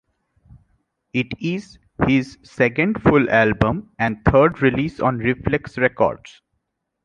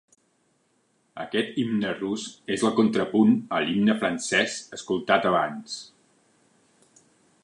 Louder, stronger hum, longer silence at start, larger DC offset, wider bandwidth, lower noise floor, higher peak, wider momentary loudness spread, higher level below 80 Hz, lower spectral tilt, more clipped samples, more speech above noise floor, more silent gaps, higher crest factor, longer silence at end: first, -19 LUFS vs -24 LUFS; neither; about the same, 1.15 s vs 1.15 s; neither; second, 9.2 kHz vs 11 kHz; first, -75 dBFS vs -68 dBFS; first, -2 dBFS vs -6 dBFS; second, 10 LU vs 14 LU; first, -40 dBFS vs -66 dBFS; first, -8 dB/octave vs -4.5 dB/octave; neither; first, 57 dB vs 44 dB; neither; about the same, 18 dB vs 20 dB; second, 0.9 s vs 1.6 s